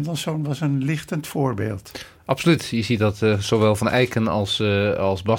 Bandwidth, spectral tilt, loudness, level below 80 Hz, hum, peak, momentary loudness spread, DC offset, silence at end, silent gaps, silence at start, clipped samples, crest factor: 18 kHz; -6 dB/octave; -21 LUFS; -50 dBFS; none; -4 dBFS; 8 LU; under 0.1%; 0 s; none; 0 s; under 0.1%; 18 dB